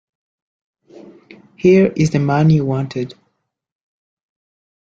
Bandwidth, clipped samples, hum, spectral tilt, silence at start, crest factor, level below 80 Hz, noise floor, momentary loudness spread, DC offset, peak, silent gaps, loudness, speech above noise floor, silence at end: 7.8 kHz; under 0.1%; none; -8 dB/octave; 1.65 s; 18 dB; -54 dBFS; -70 dBFS; 13 LU; under 0.1%; -2 dBFS; none; -15 LUFS; 56 dB; 1.8 s